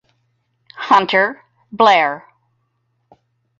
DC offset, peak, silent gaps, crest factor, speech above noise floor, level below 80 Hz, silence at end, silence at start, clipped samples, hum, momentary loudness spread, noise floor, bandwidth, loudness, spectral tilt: under 0.1%; 0 dBFS; none; 18 dB; 53 dB; -66 dBFS; 1.4 s; 0.75 s; under 0.1%; none; 19 LU; -67 dBFS; 7.8 kHz; -14 LUFS; -4 dB/octave